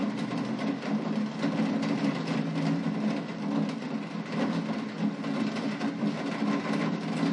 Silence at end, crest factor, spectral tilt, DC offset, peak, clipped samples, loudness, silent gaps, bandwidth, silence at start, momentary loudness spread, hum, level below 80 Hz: 0 s; 14 dB; -6.5 dB/octave; under 0.1%; -16 dBFS; under 0.1%; -30 LUFS; none; 11 kHz; 0 s; 3 LU; none; -78 dBFS